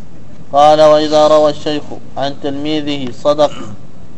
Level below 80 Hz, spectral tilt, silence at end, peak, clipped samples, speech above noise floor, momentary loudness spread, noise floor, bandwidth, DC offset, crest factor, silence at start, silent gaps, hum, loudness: -46 dBFS; -5 dB/octave; 0.4 s; 0 dBFS; 0.6%; 25 dB; 14 LU; -36 dBFS; 9.4 kHz; 9%; 14 dB; 0.4 s; none; none; -12 LUFS